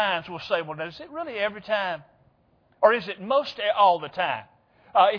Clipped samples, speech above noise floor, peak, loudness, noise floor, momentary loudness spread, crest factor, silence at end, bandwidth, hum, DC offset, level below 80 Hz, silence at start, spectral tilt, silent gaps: under 0.1%; 39 dB; -4 dBFS; -25 LUFS; -63 dBFS; 13 LU; 20 dB; 0 s; 5.4 kHz; none; under 0.1%; -68 dBFS; 0 s; -5.5 dB/octave; none